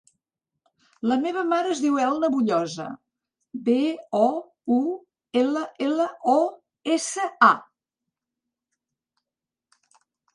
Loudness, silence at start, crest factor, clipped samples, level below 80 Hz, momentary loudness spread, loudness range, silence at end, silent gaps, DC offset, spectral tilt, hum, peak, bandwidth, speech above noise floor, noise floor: -23 LUFS; 1.05 s; 24 dB; under 0.1%; -76 dBFS; 12 LU; 3 LU; 2.7 s; none; under 0.1%; -4 dB/octave; none; -2 dBFS; 11 kHz; 66 dB; -89 dBFS